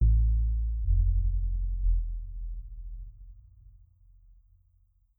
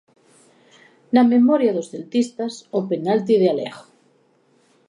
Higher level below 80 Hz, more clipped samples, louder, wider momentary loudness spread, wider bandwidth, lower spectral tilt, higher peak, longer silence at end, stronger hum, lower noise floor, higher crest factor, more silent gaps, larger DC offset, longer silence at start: first, -28 dBFS vs -76 dBFS; neither; second, -31 LUFS vs -19 LUFS; first, 18 LU vs 12 LU; second, 0.4 kHz vs 10.5 kHz; first, -14 dB/octave vs -6.5 dB/octave; second, -14 dBFS vs -4 dBFS; first, 1.8 s vs 1.05 s; neither; first, -66 dBFS vs -60 dBFS; about the same, 14 dB vs 18 dB; neither; neither; second, 0 s vs 1.1 s